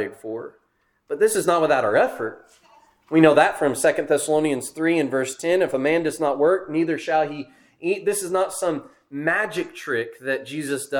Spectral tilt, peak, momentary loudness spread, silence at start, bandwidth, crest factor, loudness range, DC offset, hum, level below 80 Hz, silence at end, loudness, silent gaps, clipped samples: -4.5 dB/octave; 0 dBFS; 13 LU; 0 s; 19 kHz; 22 dB; 5 LU; under 0.1%; none; -64 dBFS; 0 s; -22 LUFS; none; under 0.1%